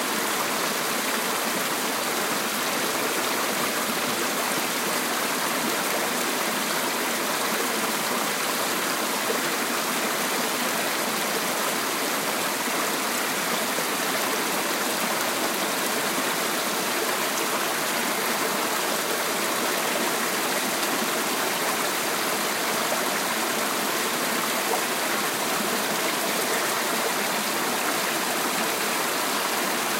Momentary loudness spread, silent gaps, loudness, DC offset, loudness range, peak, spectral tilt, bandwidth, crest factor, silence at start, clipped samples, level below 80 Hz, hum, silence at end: 1 LU; none; -24 LUFS; under 0.1%; 0 LU; -10 dBFS; -1 dB/octave; 16 kHz; 14 dB; 0 s; under 0.1%; -78 dBFS; none; 0 s